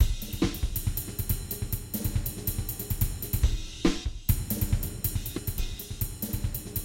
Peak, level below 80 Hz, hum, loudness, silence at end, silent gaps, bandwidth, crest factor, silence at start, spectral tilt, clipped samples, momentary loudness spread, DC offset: -10 dBFS; -34 dBFS; none; -31 LUFS; 0 s; none; 17 kHz; 20 dB; 0 s; -5 dB/octave; under 0.1%; 5 LU; under 0.1%